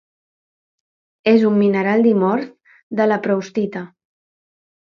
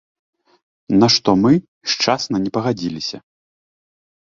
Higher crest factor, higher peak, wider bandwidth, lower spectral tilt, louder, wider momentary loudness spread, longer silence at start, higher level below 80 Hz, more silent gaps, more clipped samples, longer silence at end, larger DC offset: about the same, 16 dB vs 20 dB; about the same, -2 dBFS vs 0 dBFS; second, 6.6 kHz vs 7.6 kHz; first, -7.5 dB/octave vs -4.5 dB/octave; about the same, -17 LUFS vs -17 LUFS; about the same, 14 LU vs 12 LU; first, 1.25 s vs 0.9 s; second, -68 dBFS vs -54 dBFS; second, 2.83-2.90 s vs 1.68-1.81 s; neither; second, 1 s vs 1.15 s; neither